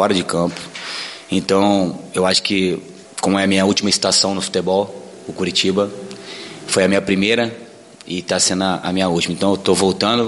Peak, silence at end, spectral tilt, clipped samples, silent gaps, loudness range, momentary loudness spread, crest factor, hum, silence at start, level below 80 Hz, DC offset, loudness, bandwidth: -2 dBFS; 0 s; -3.5 dB/octave; under 0.1%; none; 3 LU; 13 LU; 16 dB; none; 0 s; -54 dBFS; under 0.1%; -17 LUFS; 11.5 kHz